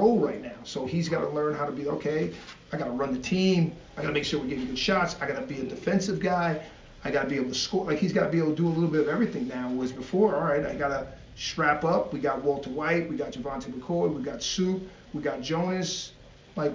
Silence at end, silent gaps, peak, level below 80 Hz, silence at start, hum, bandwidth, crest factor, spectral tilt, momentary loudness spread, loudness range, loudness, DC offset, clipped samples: 0 s; none; -10 dBFS; -54 dBFS; 0 s; none; 7.6 kHz; 18 dB; -5.5 dB/octave; 10 LU; 3 LU; -28 LUFS; under 0.1%; under 0.1%